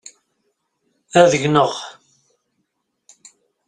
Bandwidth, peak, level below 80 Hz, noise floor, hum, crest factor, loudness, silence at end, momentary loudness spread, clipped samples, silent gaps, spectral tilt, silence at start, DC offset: 9.8 kHz; 0 dBFS; -60 dBFS; -73 dBFS; none; 20 dB; -16 LUFS; 1.75 s; 17 LU; under 0.1%; none; -4.5 dB/octave; 1.15 s; under 0.1%